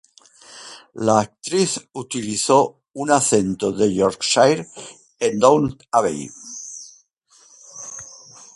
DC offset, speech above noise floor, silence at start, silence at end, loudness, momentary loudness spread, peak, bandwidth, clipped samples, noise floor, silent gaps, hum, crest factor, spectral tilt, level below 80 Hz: under 0.1%; 36 dB; 0.5 s; 0.5 s; -19 LUFS; 22 LU; 0 dBFS; 11.5 kHz; under 0.1%; -55 dBFS; 7.13-7.17 s; none; 20 dB; -4 dB/octave; -56 dBFS